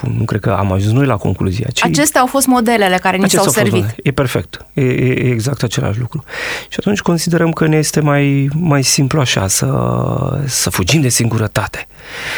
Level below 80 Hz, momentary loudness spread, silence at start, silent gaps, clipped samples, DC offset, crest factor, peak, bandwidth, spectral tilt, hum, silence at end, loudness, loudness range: -40 dBFS; 8 LU; 0 s; none; under 0.1%; under 0.1%; 12 dB; 0 dBFS; over 20 kHz; -4.5 dB/octave; none; 0 s; -14 LUFS; 3 LU